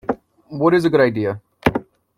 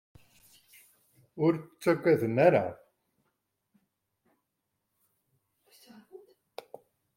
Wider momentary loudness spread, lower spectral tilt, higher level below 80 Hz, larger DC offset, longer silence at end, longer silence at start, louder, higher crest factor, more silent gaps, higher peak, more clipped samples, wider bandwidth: second, 14 LU vs 24 LU; about the same, -7.5 dB/octave vs -7.5 dB/octave; first, -46 dBFS vs -74 dBFS; neither; second, 0.35 s vs 1 s; second, 0.1 s vs 1.35 s; first, -19 LUFS vs -27 LUFS; second, 18 dB vs 24 dB; neither; first, -2 dBFS vs -8 dBFS; neither; about the same, 15.5 kHz vs 16.5 kHz